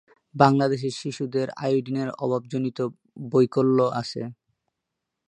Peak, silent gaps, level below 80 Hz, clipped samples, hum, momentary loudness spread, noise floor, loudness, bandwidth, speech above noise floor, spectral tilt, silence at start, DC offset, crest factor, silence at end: -2 dBFS; none; -66 dBFS; under 0.1%; none; 13 LU; -83 dBFS; -24 LUFS; 10 kHz; 59 dB; -7 dB/octave; 0.35 s; under 0.1%; 24 dB; 0.95 s